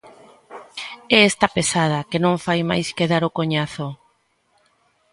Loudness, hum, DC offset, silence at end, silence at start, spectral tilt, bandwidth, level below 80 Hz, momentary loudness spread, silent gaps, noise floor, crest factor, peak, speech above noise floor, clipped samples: -19 LUFS; none; under 0.1%; 1.15 s; 0.05 s; -4.5 dB/octave; 11.5 kHz; -56 dBFS; 18 LU; none; -64 dBFS; 20 dB; 0 dBFS; 45 dB; under 0.1%